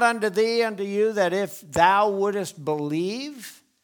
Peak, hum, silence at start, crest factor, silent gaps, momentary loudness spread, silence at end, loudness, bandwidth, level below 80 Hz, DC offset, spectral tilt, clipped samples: -2 dBFS; none; 0 s; 20 dB; none; 13 LU; 0.3 s; -23 LUFS; 19.5 kHz; -60 dBFS; under 0.1%; -4.5 dB/octave; under 0.1%